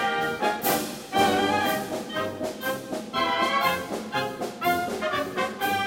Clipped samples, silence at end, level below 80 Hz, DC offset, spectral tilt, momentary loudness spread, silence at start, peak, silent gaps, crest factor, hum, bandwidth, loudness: under 0.1%; 0 s; -60 dBFS; under 0.1%; -3.5 dB/octave; 8 LU; 0 s; -8 dBFS; none; 18 dB; none; 17 kHz; -26 LUFS